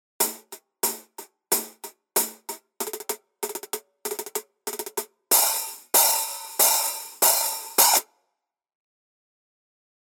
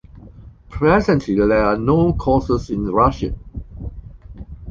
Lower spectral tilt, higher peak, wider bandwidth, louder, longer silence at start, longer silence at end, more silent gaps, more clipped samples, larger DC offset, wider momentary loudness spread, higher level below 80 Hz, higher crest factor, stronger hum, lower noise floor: second, 1.5 dB/octave vs -8.5 dB/octave; about the same, -2 dBFS vs -2 dBFS; first, over 20 kHz vs 7.6 kHz; second, -22 LUFS vs -17 LUFS; about the same, 0.2 s vs 0.15 s; first, 2 s vs 0 s; neither; neither; neither; second, 16 LU vs 19 LU; second, -90 dBFS vs -32 dBFS; first, 24 dB vs 16 dB; neither; first, -81 dBFS vs -41 dBFS